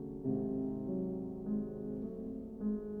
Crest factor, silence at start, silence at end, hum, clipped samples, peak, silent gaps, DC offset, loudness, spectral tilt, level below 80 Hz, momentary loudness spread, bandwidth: 14 dB; 0 s; 0 s; none; under 0.1%; -24 dBFS; none; under 0.1%; -39 LUFS; -12.5 dB/octave; -58 dBFS; 6 LU; 1.8 kHz